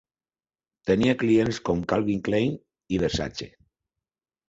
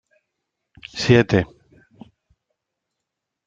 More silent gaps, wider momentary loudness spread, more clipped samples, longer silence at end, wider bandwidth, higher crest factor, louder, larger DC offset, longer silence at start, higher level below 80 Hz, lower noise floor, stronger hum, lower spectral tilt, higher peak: neither; second, 13 LU vs 20 LU; neither; second, 1 s vs 2 s; about the same, 8 kHz vs 7.8 kHz; about the same, 18 dB vs 22 dB; second, -25 LUFS vs -18 LUFS; neither; about the same, 0.85 s vs 0.95 s; about the same, -48 dBFS vs -52 dBFS; first, under -90 dBFS vs -82 dBFS; neither; about the same, -6 dB/octave vs -6.5 dB/octave; second, -8 dBFS vs -2 dBFS